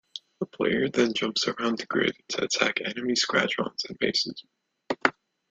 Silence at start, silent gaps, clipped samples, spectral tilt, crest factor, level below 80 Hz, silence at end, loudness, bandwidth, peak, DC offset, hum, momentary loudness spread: 0.15 s; none; under 0.1%; -3 dB/octave; 26 dB; -66 dBFS; 0.4 s; -26 LUFS; 9.4 kHz; -2 dBFS; under 0.1%; none; 9 LU